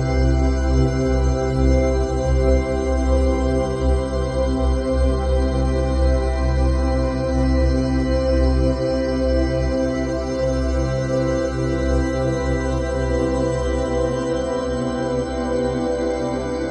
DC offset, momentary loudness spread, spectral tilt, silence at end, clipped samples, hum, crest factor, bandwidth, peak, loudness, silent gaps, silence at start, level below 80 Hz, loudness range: under 0.1%; 4 LU; -7 dB/octave; 0 s; under 0.1%; none; 14 dB; 9 kHz; -4 dBFS; -20 LUFS; none; 0 s; -22 dBFS; 2 LU